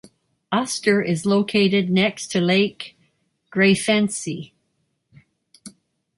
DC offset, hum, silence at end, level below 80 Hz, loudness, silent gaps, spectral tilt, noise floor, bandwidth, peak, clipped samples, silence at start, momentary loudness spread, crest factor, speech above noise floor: under 0.1%; none; 0.5 s; -62 dBFS; -20 LUFS; none; -4.5 dB/octave; -71 dBFS; 11.5 kHz; -6 dBFS; under 0.1%; 0.5 s; 12 LU; 16 dB; 52 dB